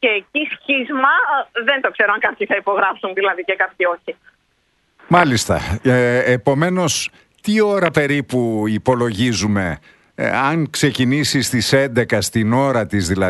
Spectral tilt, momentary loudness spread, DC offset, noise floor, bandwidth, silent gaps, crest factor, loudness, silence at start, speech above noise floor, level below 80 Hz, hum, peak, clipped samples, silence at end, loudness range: -4.5 dB/octave; 5 LU; under 0.1%; -63 dBFS; 12.5 kHz; none; 18 dB; -17 LUFS; 0 s; 46 dB; -44 dBFS; none; 0 dBFS; under 0.1%; 0 s; 2 LU